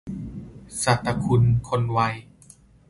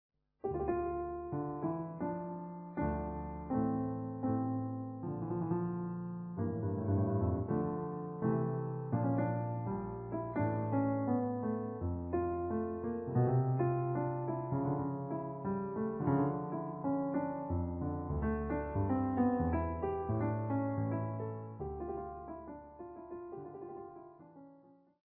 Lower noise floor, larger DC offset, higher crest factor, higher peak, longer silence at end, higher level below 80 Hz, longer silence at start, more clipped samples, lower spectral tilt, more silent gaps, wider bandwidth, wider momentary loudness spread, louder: second, -52 dBFS vs -62 dBFS; neither; about the same, 20 dB vs 16 dB; first, -6 dBFS vs -20 dBFS; about the same, 0.65 s vs 0.6 s; first, -44 dBFS vs -54 dBFS; second, 0.05 s vs 0.45 s; neither; second, -5.5 dB/octave vs -12 dB/octave; neither; first, 11.5 kHz vs 2.9 kHz; first, 17 LU vs 11 LU; first, -22 LUFS vs -37 LUFS